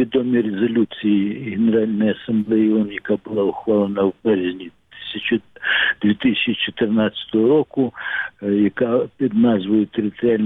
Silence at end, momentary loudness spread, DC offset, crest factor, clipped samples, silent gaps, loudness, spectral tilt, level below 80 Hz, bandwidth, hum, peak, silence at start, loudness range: 0 s; 7 LU; under 0.1%; 12 dB; under 0.1%; none; -19 LUFS; -9 dB/octave; -58 dBFS; 4 kHz; none; -8 dBFS; 0 s; 2 LU